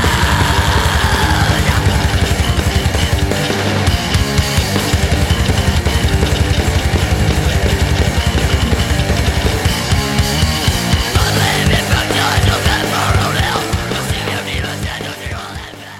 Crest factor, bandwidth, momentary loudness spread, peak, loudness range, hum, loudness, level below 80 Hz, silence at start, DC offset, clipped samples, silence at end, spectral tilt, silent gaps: 14 dB; 16.5 kHz; 5 LU; 0 dBFS; 1 LU; none; -14 LUFS; -20 dBFS; 0 s; under 0.1%; under 0.1%; 0 s; -4.5 dB/octave; none